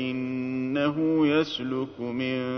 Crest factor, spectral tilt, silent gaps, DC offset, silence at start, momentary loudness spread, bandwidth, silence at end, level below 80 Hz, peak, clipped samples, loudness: 16 dB; -7 dB/octave; none; under 0.1%; 0 s; 8 LU; 6.6 kHz; 0 s; -66 dBFS; -12 dBFS; under 0.1%; -27 LUFS